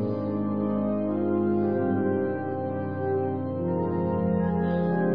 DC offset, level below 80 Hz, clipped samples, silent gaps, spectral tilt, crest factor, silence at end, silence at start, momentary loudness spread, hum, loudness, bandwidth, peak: 0.4%; -56 dBFS; under 0.1%; none; -12.5 dB/octave; 12 dB; 0 s; 0 s; 5 LU; none; -27 LUFS; 4.9 kHz; -14 dBFS